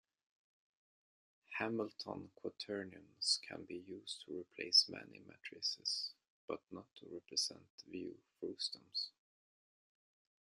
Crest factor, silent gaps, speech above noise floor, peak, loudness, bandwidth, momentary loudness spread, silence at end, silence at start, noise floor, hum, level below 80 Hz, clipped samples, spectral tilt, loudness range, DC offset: 26 dB; 6.30-6.48 s, 7.70-7.78 s; over 47 dB; -18 dBFS; -40 LUFS; 13.5 kHz; 18 LU; 1.4 s; 1.5 s; under -90 dBFS; none; -88 dBFS; under 0.1%; -1.5 dB/octave; 7 LU; under 0.1%